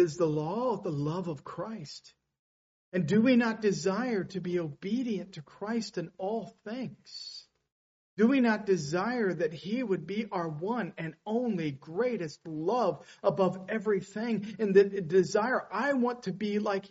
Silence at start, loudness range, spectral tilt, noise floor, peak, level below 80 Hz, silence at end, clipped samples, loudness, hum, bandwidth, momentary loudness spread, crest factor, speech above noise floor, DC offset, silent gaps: 0 s; 6 LU; -5.5 dB/octave; under -90 dBFS; -10 dBFS; -72 dBFS; 0.05 s; under 0.1%; -30 LUFS; none; 8 kHz; 14 LU; 20 dB; over 60 dB; under 0.1%; 2.39-2.92 s, 7.72-8.17 s